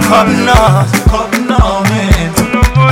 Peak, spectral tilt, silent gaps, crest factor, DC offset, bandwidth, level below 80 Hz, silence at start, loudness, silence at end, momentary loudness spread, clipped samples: 0 dBFS; -5.5 dB/octave; none; 8 dB; under 0.1%; 17.5 kHz; -16 dBFS; 0 s; -10 LUFS; 0 s; 4 LU; 4%